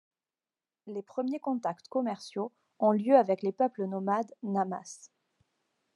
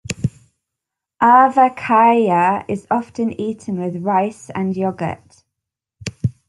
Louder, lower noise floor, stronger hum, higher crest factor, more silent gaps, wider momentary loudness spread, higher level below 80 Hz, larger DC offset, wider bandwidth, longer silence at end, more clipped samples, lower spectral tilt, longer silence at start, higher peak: second, -31 LUFS vs -17 LUFS; first, under -90 dBFS vs -83 dBFS; neither; first, 22 dB vs 16 dB; neither; about the same, 16 LU vs 14 LU; second, -90 dBFS vs -54 dBFS; neither; about the same, 11 kHz vs 11.5 kHz; first, 0.9 s vs 0.15 s; neither; about the same, -7 dB/octave vs -6.5 dB/octave; first, 0.85 s vs 0.1 s; second, -10 dBFS vs -2 dBFS